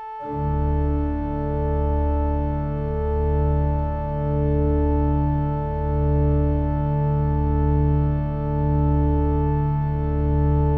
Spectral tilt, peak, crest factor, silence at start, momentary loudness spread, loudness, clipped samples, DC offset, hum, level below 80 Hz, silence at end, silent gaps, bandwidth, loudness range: -12.5 dB/octave; -10 dBFS; 10 dB; 0 s; 5 LU; -22 LUFS; under 0.1%; under 0.1%; none; -26 dBFS; 0 s; none; 3.2 kHz; 2 LU